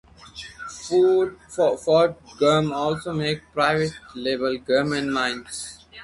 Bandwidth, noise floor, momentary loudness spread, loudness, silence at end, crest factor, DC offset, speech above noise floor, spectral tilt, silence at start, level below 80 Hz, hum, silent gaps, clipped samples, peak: 11.5 kHz; -42 dBFS; 16 LU; -22 LUFS; 0 s; 16 dB; under 0.1%; 20 dB; -5 dB/octave; 0.25 s; -54 dBFS; none; none; under 0.1%; -6 dBFS